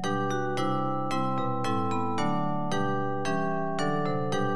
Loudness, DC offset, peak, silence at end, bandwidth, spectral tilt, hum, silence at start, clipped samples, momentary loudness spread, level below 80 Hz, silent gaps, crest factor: -29 LUFS; 2%; -14 dBFS; 0 s; 12.5 kHz; -6 dB/octave; none; 0 s; under 0.1%; 1 LU; -64 dBFS; none; 14 dB